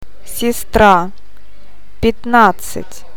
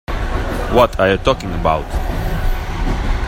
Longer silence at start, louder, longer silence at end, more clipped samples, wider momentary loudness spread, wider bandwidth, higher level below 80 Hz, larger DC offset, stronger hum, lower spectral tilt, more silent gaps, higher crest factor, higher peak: first, 0.3 s vs 0.1 s; first, -13 LUFS vs -18 LUFS; first, 0.2 s vs 0 s; first, 0.1% vs under 0.1%; first, 18 LU vs 9 LU; first, 19.5 kHz vs 16.5 kHz; second, -32 dBFS vs -20 dBFS; first, 9% vs under 0.1%; neither; second, -4.5 dB/octave vs -6 dB/octave; neither; about the same, 16 dB vs 16 dB; about the same, 0 dBFS vs 0 dBFS